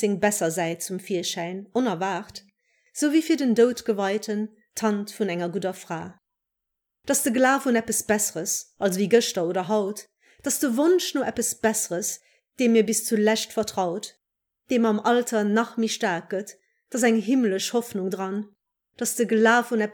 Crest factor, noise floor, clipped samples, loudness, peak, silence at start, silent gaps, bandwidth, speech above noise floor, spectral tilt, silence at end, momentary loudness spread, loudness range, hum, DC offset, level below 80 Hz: 18 dB; -83 dBFS; under 0.1%; -24 LUFS; -6 dBFS; 0 s; none; over 20 kHz; 60 dB; -3.5 dB/octave; 0 s; 13 LU; 3 LU; none; under 0.1%; -68 dBFS